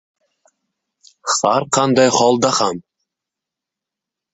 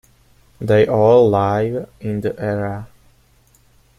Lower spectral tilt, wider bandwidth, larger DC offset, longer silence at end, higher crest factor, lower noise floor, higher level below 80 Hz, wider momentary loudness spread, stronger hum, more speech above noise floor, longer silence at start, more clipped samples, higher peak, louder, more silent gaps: second, -3.5 dB/octave vs -8.5 dB/octave; second, 8.4 kHz vs 13 kHz; neither; first, 1.55 s vs 1.1 s; about the same, 18 dB vs 16 dB; first, -85 dBFS vs -54 dBFS; second, -62 dBFS vs -50 dBFS; second, 10 LU vs 15 LU; neither; first, 70 dB vs 38 dB; first, 1.25 s vs 0.6 s; neither; about the same, -2 dBFS vs -2 dBFS; about the same, -15 LUFS vs -17 LUFS; neither